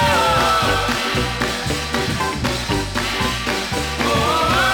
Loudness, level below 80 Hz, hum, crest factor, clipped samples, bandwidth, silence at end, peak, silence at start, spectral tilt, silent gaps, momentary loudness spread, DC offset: -19 LUFS; -32 dBFS; none; 14 dB; under 0.1%; over 20 kHz; 0 s; -4 dBFS; 0 s; -3.5 dB/octave; none; 6 LU; under 0.1%